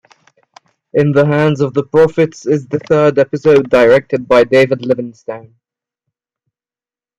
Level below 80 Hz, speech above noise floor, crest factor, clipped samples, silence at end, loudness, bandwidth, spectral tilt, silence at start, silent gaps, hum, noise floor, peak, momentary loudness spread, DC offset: -52 dBFS; over 78 dB; 12 dB; under 0.1%; 1.8 s; -12 LUFS; 9.8 kHz; -7 dB/octave; 0.95 s; none; none; under -90 dBFS; 0 dBFS; 9 LU; under 0.1%